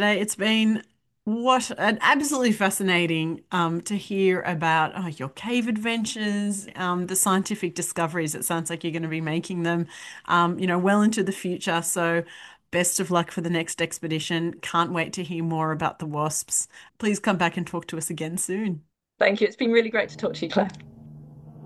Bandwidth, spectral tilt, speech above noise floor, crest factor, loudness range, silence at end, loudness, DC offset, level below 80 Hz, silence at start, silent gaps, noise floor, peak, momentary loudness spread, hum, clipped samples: 13 kHz; -4 dB/octave; 20 dB; 20 dB; 4 LU; 0 s; -24 LUFS; under 0.1%; -66 dBFS; 0 s; none; -44 dBFS; -6 dBFS; 8 LU; none; under 0.1%